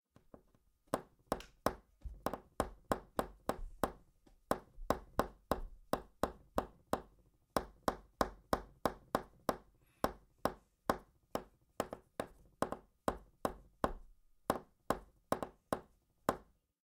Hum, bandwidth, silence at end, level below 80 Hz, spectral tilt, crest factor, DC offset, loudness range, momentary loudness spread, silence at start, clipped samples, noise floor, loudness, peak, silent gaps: none; 17 kHz; 0.4 s; -56 dBFS; -5 dB/octave; 30 dB; under 0.1%; 2 LU; 6 LU; 0.95 s; under 0.1%; -72 dBFS; -42 LUFS; -12 dBFS; none